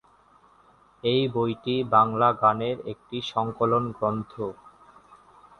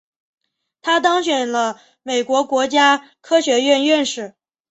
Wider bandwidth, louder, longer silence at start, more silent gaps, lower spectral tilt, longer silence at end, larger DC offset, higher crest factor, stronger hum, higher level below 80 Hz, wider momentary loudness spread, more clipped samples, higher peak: first, 9.8 kHz vs 8.2 kHz; second, -25 LUFS vs -17 LUFS; first, 1.05 s vs 0.85 s; neither; first, -7.5 dB/octave vs -1.5 dB/octave; first, 1.05 s vs 0.4 s; neither; about the same, 20 dB vs 16 dB; neither; first, -60 dBFS vs -68 dBFS; first, 14 LU vs 11 LU; neither; second, -6 dBFS vs -2 dBFS